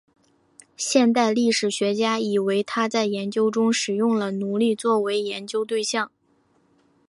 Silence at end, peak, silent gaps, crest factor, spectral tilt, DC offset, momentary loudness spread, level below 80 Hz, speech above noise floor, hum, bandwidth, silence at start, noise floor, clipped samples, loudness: 1 s; -6 dBFS; none; 18 dB; -4 dB/octave; under 0.1%; 6 LU; -74 dBFS; 42 dB; none; 11.5 kHz; 0.8 s; -64 dBFS; under 0.1%; -22 LUFS